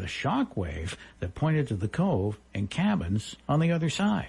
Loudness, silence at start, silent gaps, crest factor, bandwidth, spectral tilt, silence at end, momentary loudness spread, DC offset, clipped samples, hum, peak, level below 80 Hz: -29 LUFS; 0 s; none; 12 dB; 11.5 kHz; -6.5 dB/octave; 0 s; 9 LU; under 0.1%; under 0.1%; none; -16 dBFS; -50 dBFS